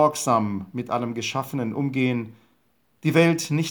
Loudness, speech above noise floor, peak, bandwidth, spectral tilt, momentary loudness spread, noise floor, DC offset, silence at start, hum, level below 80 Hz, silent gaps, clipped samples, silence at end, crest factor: -24 LUFS; 44 dB; -4 dBFS; over 20 kHz; -5.5 dB/octave; 10 LU; -67 dBFS; under 0.1%; 0 s; none; -72 dBFS; none; under 0.1%; 0 s; 18 dB